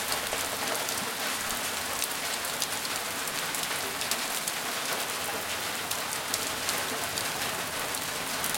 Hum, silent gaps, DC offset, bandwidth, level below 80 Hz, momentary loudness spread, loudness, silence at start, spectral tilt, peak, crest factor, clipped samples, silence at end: none; none; under 0.1%; 17 kHz; -62 dBFS; 2 LU; -30 LUFS; 0 s; -0.5 dB/octave; -4 dBFS; 28 dB; under 0.1%; 0 s